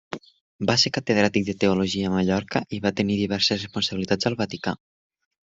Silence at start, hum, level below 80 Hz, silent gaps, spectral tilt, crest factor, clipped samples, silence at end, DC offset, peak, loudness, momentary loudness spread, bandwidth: 0.1 s; none; -60 dBFS; 0.41-0.59 s; -4.5 dB/octave; 20 dB; under 0.1%; 0.8 s; under 0.1%; -4 dBFS; -23 LUFS; 9 LU; 7.8 kHz